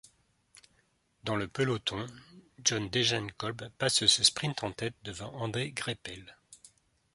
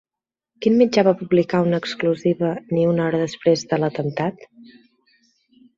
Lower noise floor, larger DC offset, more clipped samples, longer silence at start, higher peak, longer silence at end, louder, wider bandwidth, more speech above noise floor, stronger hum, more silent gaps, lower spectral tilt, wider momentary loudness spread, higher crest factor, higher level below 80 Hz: second, -72 dBFS vs -89 dBFS; neither; neither; first, 1.25 s vs 0.6 s; second, -8 dBFS vs -2 dBFS; second, 0.6 s vs 1.15 s; second, -30 LUFS vs -20 LUFS; first, 11.5 kHz vs 7.6 kHz; second, 40 dB vs 69 dB; neither; neither; second, -2.5 dB/octave vs -6.5 dB/octave; first, 17 LU vs 8 LU; first, 26 dB vs 18 dB; about the same, -62 dBFS vs -62 dBFS